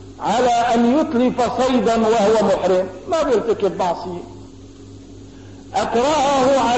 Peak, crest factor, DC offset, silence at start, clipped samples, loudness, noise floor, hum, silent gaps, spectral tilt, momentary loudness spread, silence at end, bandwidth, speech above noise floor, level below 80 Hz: -6 dBFS; 12 dB; 0.3%; 0 s; under 0.1%; -17 LUFS; -39 dBFS; none; none; -5 dB/octave; 8 LU; 0 s; 8.4 kHz; 22 dB; -46 dBFS